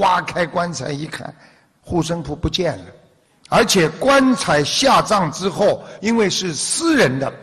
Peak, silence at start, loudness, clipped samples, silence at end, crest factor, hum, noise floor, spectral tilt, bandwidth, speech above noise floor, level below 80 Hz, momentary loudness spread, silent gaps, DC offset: -2 dBFS; 0 s; -17 LUFS; under 0.1%; 0 s; 16 dB; none; -52 dBFS; -4 dB/octave; 13.5 kHz; 34 dB; -42 dBFS; 11 LU; none; under 0.1%